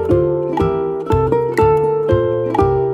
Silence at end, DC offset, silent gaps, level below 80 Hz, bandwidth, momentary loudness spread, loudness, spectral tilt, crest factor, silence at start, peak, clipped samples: 0 s; under 0.1%; none; -32 dBFS; 13.5 kHz; 4 LU; -16 LUFS; -9 dB/octave; 14 dB; 0 s; -2 dBFS; under 0.1%